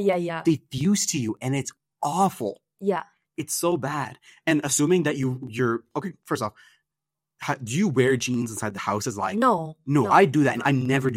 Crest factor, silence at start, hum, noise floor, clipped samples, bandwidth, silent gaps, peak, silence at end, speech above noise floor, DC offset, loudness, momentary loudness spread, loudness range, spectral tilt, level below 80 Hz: 20 dB; 0 s; none; -87 dBFS; under 0.1%; 16 kHz; none; -4 dBFS; 0 s; 64 dB; under 0.1%; -24 LUFS; 11 LU; 5 LU; -5 dB/octave; -64 dBFS